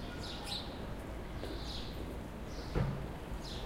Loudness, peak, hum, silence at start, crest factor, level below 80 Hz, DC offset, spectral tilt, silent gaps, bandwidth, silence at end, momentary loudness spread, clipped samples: -42 LUFS; -22 dBFS; none; 0 s; 20 dB; -46 dBFS; under 0.1%; -5.5 dB/octave; none; 16 kHz; 0 s; 7 LU; under 0.1%